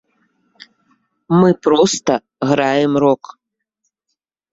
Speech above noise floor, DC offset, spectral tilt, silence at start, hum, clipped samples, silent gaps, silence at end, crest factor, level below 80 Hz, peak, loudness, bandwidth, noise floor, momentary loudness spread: 61 dB; under 0.1%; -5.5 dB/octave; 1.3 s; none; under 0.1%; none; 1.35 s; 16 dB; -58 dBFS; -2 dBFS; -15 LUFS; 8 kHz; -76 dBFS; 7 LU